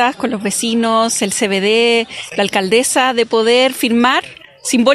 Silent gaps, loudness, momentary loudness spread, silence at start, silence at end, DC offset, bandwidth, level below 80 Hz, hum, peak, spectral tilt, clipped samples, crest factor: none; -14 LUFS; 6 LU; 0 s; 0 s; under 0.1%; 15 kHz; -58 dBFS; none; 0 dBFS; -2.5 dB/octave; under 0.1%; 14 dB